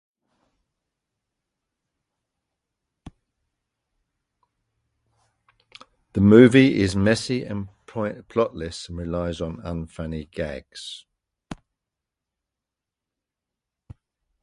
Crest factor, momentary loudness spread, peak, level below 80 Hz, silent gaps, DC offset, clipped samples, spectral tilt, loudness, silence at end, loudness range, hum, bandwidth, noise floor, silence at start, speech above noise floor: 24 dB; 23 LU; 0 dBFS; -46 dBFS; none; under 0.1%; under 0.1%; -6.5 dB/octave; -21 LUFS; 2.9 s; 19 LU; none; 11.5 kHz; -87 dBFS; 6.15 s; 66 dB